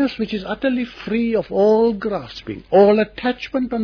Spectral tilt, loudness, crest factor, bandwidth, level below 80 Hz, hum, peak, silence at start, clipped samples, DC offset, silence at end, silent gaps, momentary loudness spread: -7.5 dB/octave; -19 LUFS; 16 dB; 5.4 kHz; -48 dBFS; none; -2 dBFS; 0 s; under 0.1%; under 0.1%; 0 s; none; 11 LU